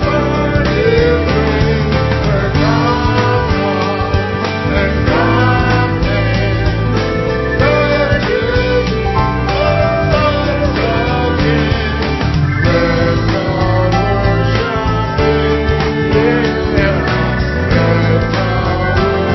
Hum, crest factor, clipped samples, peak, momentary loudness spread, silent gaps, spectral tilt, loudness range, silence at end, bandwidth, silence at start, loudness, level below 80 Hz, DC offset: none; 12 dB; under 0.1%; 0 dBFS; 3 LU; none; -7.5 dB/octave; 1 LU; 0 s; 6 kHz; 0 s; -13 LUFS; -22 dBFS; under 0.1%